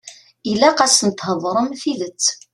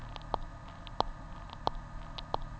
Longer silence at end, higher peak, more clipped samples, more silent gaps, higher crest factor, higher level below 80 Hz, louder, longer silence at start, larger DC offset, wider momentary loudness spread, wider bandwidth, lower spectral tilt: first, 0.2 s vs 0 s; first, 0 dBFS vs -10 dBFS; neither; neither; second, 18 dB vs 30 dB; second, -60 dBFS vs -46 dBFS; first, -17 LUFS vs -41 LUFS; about the same, 0.05 s vs 0 s; neither; about the same, 10 LU vs 10 LU; first, 13 kHz vs 8 kHz; second, -2.5 dB/octave vs -5.5 dB/octave